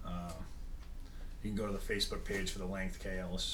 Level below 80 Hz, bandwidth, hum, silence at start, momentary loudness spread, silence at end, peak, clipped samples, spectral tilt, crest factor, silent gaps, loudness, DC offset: -44 dBFS; 18 kHz; none; 0 s; 16 LU; 0 s; -22 dBFS; under 0.1%; -4 dB/octave; 18 dB; none; -40 LUFS; under 0.1%